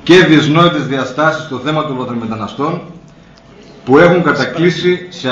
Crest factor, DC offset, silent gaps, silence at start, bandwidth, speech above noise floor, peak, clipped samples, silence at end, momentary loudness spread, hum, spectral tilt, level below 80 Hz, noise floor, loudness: 12 dB; under 0.1%; none; 0.05 s; 7.8 kHz; 28 dB; 0 dBFS; 0.5%; 0 s; 12 LU; none; -6 dB/octave; -48 dBFS; -40 dBFS; -12 LUFS